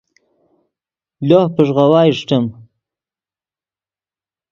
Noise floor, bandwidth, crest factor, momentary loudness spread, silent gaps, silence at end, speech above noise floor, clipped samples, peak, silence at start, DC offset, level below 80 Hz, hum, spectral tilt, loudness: under -90 dBFS; 7.4 kHz; 18 dB; 10 LU; none; 2 s; over 78 dB; under 0.1%; 0 dBFS; 1.2 s; under 0.1%; -60 dBFS; none; -8 dB/octave; -14 LUFS